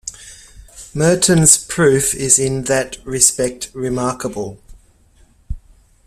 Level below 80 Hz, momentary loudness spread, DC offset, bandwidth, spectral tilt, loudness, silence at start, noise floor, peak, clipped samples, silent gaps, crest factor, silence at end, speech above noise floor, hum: -38 dBFS; 20 LU; under 0.1%; 16 kHz; -3.5 dB/octave; -14 LUFS; 0.05 s; -51 dBFS; 0 dBFS; under 0.1%; none; 18 dB; 0.5 s; 35 dB; none